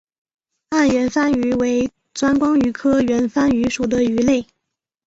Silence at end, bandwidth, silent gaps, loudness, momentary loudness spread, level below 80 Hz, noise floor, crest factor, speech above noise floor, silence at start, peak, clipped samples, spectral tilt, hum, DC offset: 0.65 s; 8 kHz; none; -18 LUFS; 5 LU; -46 dBFS; -79 dBFS; 14 dB; 62 dB; 0.7 s; -4 dBFS; under 0.1%; -5 dB/octave; none; under 0.1%